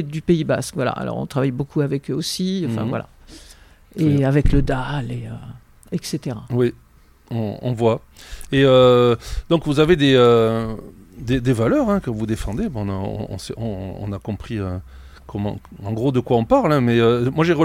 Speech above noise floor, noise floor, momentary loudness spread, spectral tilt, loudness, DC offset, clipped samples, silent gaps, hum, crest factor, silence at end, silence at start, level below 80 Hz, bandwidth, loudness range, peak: 27 dB; -46 dBFS; 15 LU; -6.5 dB/octave; -20 LUFS; under 0.1%; under 0.1%; none; none; 18 dB; 0 s; 0 s; -34 dBFS; 15.5 kHz; 10 LU; -2 dBFS